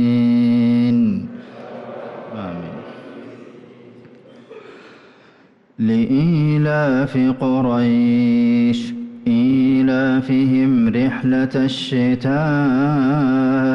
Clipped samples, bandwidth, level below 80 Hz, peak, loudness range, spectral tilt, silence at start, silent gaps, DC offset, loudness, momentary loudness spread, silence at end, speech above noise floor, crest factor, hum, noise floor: under 0.1%; 7.2 kHz; -52 dBFS; -8 dBFS; 17 LU; -8 dB/octave; 0 s; none; under 0.1%; -17 LUFS; 17 LU; 0 s; 35 dB; 8 dB; none; -51 dBFS